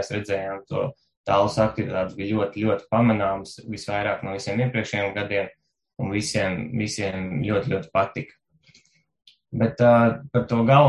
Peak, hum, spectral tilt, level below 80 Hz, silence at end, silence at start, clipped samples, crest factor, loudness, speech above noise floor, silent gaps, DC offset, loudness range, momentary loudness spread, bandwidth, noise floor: -2 dBFS; none; -6.5 dB/octave; -50 dBFS; 0 s; 0 s; under 0.1%; 20 dB; -24 LUFS; 38 dB; 1.17-1.24 s; under 0.1%; 3 LU; 12 LU; 11.5 kHz; -60 dBFS